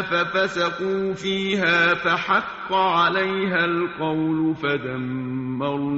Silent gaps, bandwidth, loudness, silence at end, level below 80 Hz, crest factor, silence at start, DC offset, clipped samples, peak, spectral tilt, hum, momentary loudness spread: none; 8 kHz; -22 LUFS; 0 s; -58 dBFS; 16 dB; 0 s; under 0.1%; under 0.1%; -6 dBFS; -3 dB/octave; none; 8 LU